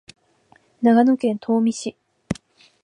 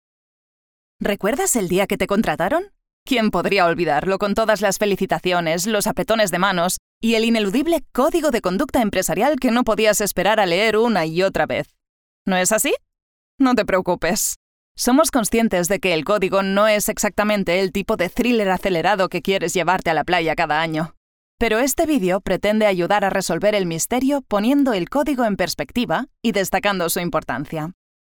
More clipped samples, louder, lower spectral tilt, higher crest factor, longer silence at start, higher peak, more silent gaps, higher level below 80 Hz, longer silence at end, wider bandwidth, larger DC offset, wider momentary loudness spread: neither; about the same, -20 LUFS vs -19 LUFS; first, -6 dB/octave vs -4 dB/octave; about the same, 18 dB vs 18 dB; second, 0.8 s vs 1 s; about the same, -4 dBFS vs -2 dBFS; second, none vs 2.93-3.06 s, 6.79-7.01 s, 11.89-12.25 s, 13.02-13.38 s, 14.36-14.75 s, 20.97-21.38 s; second, -56 dBFS vs -44 dBFS; about the same, 0.5 s vs 0.4 s; second, 10.5 kHz vs over 20 kHz; neither; first, 16 LU vs 6 LU